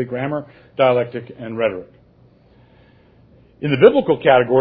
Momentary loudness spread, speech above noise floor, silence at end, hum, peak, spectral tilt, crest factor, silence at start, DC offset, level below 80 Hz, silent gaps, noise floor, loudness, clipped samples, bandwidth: 18 LU; 34 dB; 0 s; none; 0 dBFS; -10 dB/octave; 18 dB; 0 s; under 0.1%; -56 dBFS; none; -51 dBFS; -17 LUFS; under 0.1%; 5 kHz